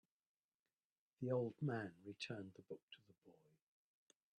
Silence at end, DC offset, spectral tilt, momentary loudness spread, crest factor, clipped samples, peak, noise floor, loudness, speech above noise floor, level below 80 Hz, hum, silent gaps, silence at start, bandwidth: 1.05 s; under 0.1%; -7 dB/octave; 15 LU; 20 dB; under 0.1%; -30 dBFS; -72 dBFS; -47 LUFS; 25 dB; -88 dBFS; none; 2.83-2.88 s; 1.2 s; 9.6 kHz